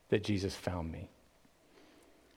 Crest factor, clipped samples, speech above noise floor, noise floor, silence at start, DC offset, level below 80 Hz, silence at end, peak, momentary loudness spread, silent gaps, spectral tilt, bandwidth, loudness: 24 dB; under 0.1%; 31 dB; -66 dBFS; 0.1 s; under 0.1%; -58 dBFS; 1.3 s; -16 dBFS; 16 LU; none; -6 dB/octave; 16.5 kHz; -37 LUFS